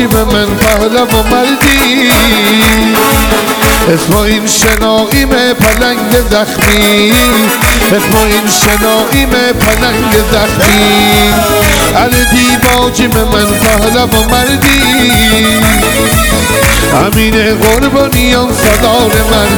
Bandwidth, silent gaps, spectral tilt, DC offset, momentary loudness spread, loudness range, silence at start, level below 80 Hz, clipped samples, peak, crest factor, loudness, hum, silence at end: over 20 kHz; none; -3.5 dB/octave; under 0.1%; 3 LU; 1 LU; 0 s; -18 dBFS; 0.5%; 0 dBFS; 8 dB; -7 LUFS; none; 0 s